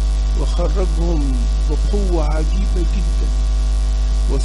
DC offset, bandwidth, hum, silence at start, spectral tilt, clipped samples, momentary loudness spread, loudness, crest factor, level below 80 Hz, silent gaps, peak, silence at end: under 0.1%; 10.5 kHz; 50 Hz at -15 dBFS; 0 s; -6.5 dB/octave; under 0.1%; 1 LU; -19 LUFS; 10 dB; -16 dBFS; none; -6 dBFS; 0 s